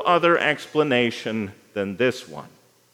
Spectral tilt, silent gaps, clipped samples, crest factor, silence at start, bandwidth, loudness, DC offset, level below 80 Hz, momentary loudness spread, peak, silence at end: -5 dB/octave; none; under 0.1%; 18 dB; 0 s; 15 kHz; -22 LUFS; under 0.1%; -72 dBFS; 16 LU; -4 dBFS; 0.45 s